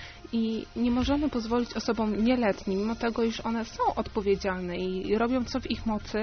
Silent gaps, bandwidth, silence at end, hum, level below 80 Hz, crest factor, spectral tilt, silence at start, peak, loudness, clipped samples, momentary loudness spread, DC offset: none; 6.6 kHz; 0 s; none; -46 dBFS; 16 dB; -4.5 dB/octave; 0 s; -12 dBFS; -29 LUFS; under 0.1%; 6 LU; under 0.1%